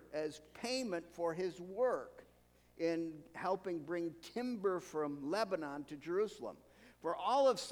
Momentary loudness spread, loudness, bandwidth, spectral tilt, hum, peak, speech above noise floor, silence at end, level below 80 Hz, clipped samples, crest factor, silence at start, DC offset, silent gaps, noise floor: 10 LU; -39 LUFS; 16.5 kHz; -4.5 dB/octave; none; -20 dBFS; 30 dB; 0 s; -74 dBFS; under 0.1%; 18 dB; 0 s; under 0.1%; none; -68 dBFS